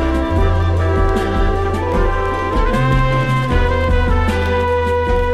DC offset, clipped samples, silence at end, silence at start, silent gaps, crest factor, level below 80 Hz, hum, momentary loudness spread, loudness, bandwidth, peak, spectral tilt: under 0.1%; under 0.1%; 0 s; 0 s; none; 12 dB; -20 dBFS; none; 2 LU; -16 LUFS; 11.5 kHz; -4 dBFS; -7 dB/octave